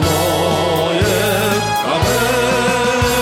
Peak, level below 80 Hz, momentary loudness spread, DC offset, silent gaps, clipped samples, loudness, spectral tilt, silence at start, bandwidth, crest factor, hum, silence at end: -4 dBFS; -34 dBFS; 1 LU; under 0.1%; none; under 0.1%; -15 LUFS; -4 dB/octave; 0 s; 16.5 kHz; 12 dB; none; 0 s